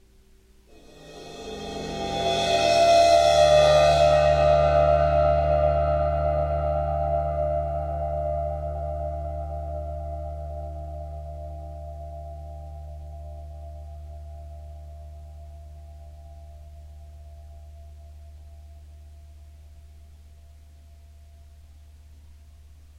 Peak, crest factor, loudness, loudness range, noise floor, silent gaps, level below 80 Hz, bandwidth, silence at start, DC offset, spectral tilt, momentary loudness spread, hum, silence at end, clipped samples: -8 dBFS; 18 dB; -22 LUFS; 25 LU; -55 dBFS; none; -38 dBFS; 13 kHz; 0.95 s; under 0.1%; -5 dB/octave; 28 LU; none; 0.3 s; under 0.1%